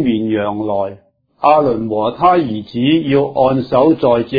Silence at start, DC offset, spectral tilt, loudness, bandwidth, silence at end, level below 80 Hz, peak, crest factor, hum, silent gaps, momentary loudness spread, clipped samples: 0 s; under 0.1%; -9.5 dB/octave; -14 LUFS; 5 kHz; 0 s; -48 dBFS; 0 dBFS; 14 dB; none; none; 7 LU; under 0.1%